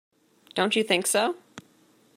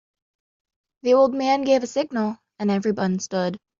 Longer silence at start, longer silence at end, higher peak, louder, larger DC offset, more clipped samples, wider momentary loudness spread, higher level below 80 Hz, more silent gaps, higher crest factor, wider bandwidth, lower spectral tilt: second, 0.55 s vs 1.05 s; first, 0.55 s vs 0.2 s; about the same, -6 dBFS vs -8 dBFS; second, -25 LUFS vs -22 LUFS; neither; neither; about the same, 11 LU vs 9 LU; second, -80 dBFS vs -66 dBFS; neither; first, 22 dB vs 16 dB; first, 16 kHz vs 7.6 kHz; second, -2.5 dB/octave vs -5.5 dB/octave